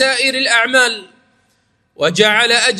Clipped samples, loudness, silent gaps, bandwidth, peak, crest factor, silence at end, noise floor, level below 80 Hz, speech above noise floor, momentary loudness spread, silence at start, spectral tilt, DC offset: under 0.1%; -12 LUFS; none; 15.5 kHz; 0 dBFS; 16 dB; 0 s; -61 dBFS; -64 dBFS; 47 dB; 8 LU; 0 s; -1.5 dB/octave; under 0.1%